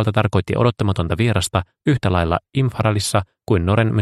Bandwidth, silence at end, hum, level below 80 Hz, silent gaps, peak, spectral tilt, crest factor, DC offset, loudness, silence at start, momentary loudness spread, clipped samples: 13 kHz; 0 s; none; -38 dBFS; none; 0 dBFS; -6 dB/octave; 18 dB; under 0.1%; -19 LUFS; 0 s; 4 LU; under 0.1%